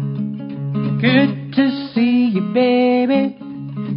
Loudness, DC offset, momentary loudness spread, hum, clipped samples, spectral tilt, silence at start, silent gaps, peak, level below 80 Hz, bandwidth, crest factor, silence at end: -17 LUFS; under 0.1%; 12 LU; none; under 0.1%; -12 dB/octave; 0 s; none; 0 dBFS; -60 dBFS; 5.4 kHz; 16 dB; 0 s